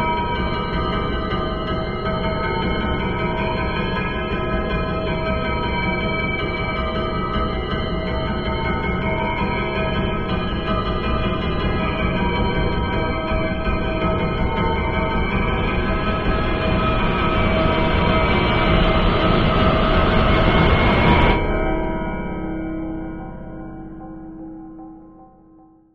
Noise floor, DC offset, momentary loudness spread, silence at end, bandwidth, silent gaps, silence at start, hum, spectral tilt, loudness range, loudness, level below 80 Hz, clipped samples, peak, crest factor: -49 dBFS; under 0.1%; 10 LU; 0.7 s; 5.8 kHz; none; 0 s; none; -8.5 dB/octave; 6 LU; -20 LUFS; -26 dBFS; under 0.1%; -2 dBFS; 16 dB